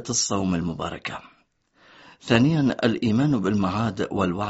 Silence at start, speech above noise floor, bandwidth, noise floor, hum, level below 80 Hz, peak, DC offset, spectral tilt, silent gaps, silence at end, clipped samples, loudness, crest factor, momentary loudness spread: 0 s; 39 dB; 8 kHz; -62 dBFS; none; -52 dBFS; -2 dBFS; under 0.1%; -5.5 dB/octave; none; 0 s; under 0.1%; -23 LUFS; 22 dB; 12 LU